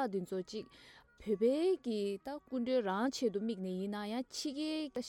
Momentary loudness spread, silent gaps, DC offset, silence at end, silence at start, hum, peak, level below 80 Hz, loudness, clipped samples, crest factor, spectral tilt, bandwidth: 10 LU; none; under 0.1%; 0 s; 0 s; none; -22 dBFS; -72 dBFS; -37 LUFS; under 0.1%; 14 dB; -5 dB/octave; 16.5 kHz